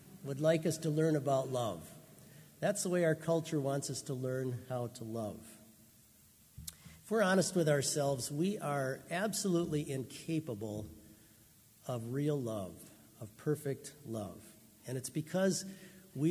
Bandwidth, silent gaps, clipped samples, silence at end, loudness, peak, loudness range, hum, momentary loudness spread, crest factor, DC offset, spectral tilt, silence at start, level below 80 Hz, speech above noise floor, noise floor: 16 kHz; none; under 0.1%; 0 s; -36 LUFS; -18 dBFS; 7 LU; none; 20 LU; 18 dB; under 0.1%; -5 dB/octave; 0 s; -68 dBFS; 28 dB; -63 dBFS